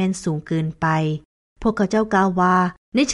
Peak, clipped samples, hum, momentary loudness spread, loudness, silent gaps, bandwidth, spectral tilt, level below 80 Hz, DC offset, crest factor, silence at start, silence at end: -6 dBFS; under 0.1%; none; 8 LU; -20 LUFS; 1.25-1.56 s, 2.77-2.92 s; 11.5 kHz; -5.5 dB/octave; -46 dBFS; under 0.1%; 14 dB; 0 s; 0 s